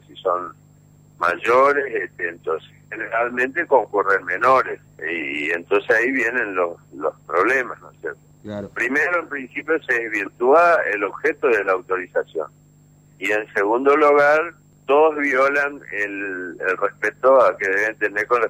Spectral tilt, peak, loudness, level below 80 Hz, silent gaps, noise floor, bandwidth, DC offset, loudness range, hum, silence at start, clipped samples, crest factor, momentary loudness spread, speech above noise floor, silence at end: -5 dB/octave; -4 dBFS; -19 LUFS; -64 dBFS; none; -51 dBFS; 15 kHz; under 0.1%; 4 LU; 50 Hz at -55 dBFS; 0.15 s; under 0.1%; 16 dB; 14 LU; 32 dB; 0 s